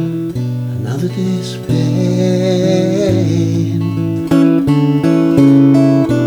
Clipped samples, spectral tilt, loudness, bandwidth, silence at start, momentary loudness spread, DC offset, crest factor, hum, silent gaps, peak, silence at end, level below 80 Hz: under 0.1%; -8 dB/octave; -13 LUFS; 14.5 kHz; 0 s; 10 LU; under 0.1%; 12 dB; none; none; 0 dBFS; 0 s; -44 dBFS